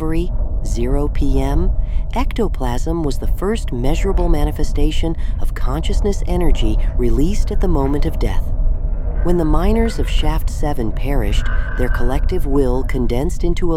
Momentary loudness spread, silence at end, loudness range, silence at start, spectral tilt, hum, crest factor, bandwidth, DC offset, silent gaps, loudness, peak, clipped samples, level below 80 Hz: 5 LU; 0 s; 1 LU; 0 s; -6.5 dB/octave; none; 14 dB; 13 kHz; under 0.1%; none; -20 LUFS; -2 dBFS; under 0.1%; -16 dBFS